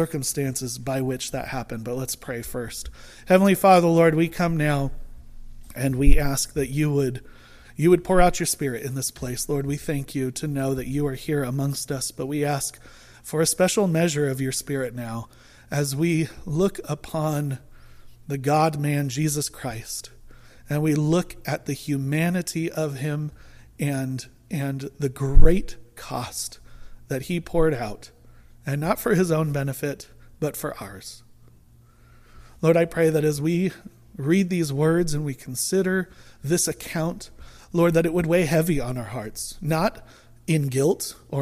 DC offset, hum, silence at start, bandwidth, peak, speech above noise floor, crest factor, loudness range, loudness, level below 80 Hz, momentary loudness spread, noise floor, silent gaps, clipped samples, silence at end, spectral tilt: under 0.1%; none; 0 s; 15.5 kHz; -2 dBFS; 31 dB; 22 dB; 6 LU; -24 LUFS; -32 dBFS; 13 LU; -53 dBFS; none; under 0.1%; 0 s; -5.5 dB/octave